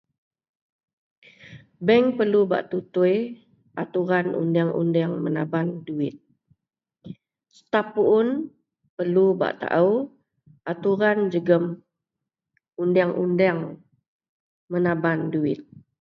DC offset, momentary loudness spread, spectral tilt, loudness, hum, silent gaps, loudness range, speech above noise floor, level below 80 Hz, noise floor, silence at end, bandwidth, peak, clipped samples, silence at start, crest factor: under 0.1%; 14 LU; -9 dB/octave; -23 LUFS; none; 8.89-8.97 s, 14.08-14.19 s, 14.29-14.68 s; 4 LU; 64 dB; -70 dBFS; -86 dBFS; 0.25 s; 6 kHz; -6 dBFS; under 0.1%; 1.45 s; 20 dB